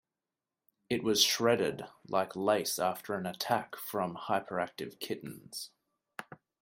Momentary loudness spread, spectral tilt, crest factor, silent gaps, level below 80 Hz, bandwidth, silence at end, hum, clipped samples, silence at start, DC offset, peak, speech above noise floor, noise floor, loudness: 18 LU; -3 dB/octave; 22 dB; none; -74 dBFS; 16 kHz; 0.25 s; none; under 0.1%; 0.9 s; under 0.1%; -12 dBFS; over 57 dB; under -90 dBFS; -32 LUFS